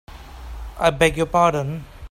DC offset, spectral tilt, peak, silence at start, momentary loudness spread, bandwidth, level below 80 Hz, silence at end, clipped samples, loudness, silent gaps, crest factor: under 0.1%; -5 dB/octave; -2 dBFS; 0.1 s; 20 LU; 16 kHz; -38 dBFS; 0.05 s; under 0.1%; -19 LUFS; none; 20 dB